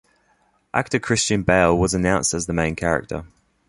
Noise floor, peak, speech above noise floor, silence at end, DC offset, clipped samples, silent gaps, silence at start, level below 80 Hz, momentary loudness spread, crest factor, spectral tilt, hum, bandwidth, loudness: -63 dBFS; -2 dBFS; 43 dB; 0.4 s; under 0.1%; under 0.1%; none; 0.75 s; -40 dBFS; 9 LU; 20 dB; -4.5 dB/octave; none; 11.5 kHz; -20 LUFS